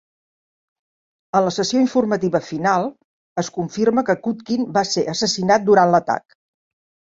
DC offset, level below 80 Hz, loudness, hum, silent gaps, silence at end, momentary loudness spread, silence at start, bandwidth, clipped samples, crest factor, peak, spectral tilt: under 0.1%; -62 dBFS; -19 LUFS; none; 3.04-3.36 s; 1 s; 11 LU; 1.35 s; 7.8 kHz; under 0.1%; 18 dB; -2 dBFS; -4.5 dB/octave